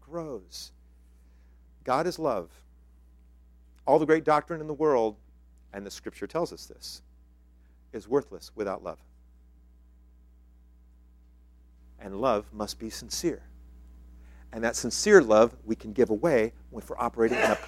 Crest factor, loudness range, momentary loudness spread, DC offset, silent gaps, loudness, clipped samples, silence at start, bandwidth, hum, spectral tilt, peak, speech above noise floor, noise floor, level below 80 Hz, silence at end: 26 dB; 12 LU; 20 LU; under 0.1%; none; -27 LUFS; under 0.1%; 0.1 s; 15.5 kHz; none; -4.5 dB/octave; -4 dBFS; 30 dB; -57 dBFS; -52 dBFS; 0 s